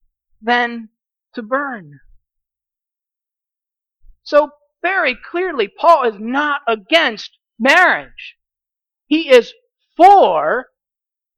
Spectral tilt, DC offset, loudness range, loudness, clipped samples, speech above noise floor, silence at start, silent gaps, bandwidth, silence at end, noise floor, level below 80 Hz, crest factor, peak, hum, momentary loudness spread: -3.5 dB/octave; under 0.1%; 11 LU; -14 LUFS; under 0.1%; 73 dB; 0.45 s; none; 15.5 kHz; 0.75 s; -87 dBFS; -56 dBFS; 16 dB; 0 dBFS; none; 22 LU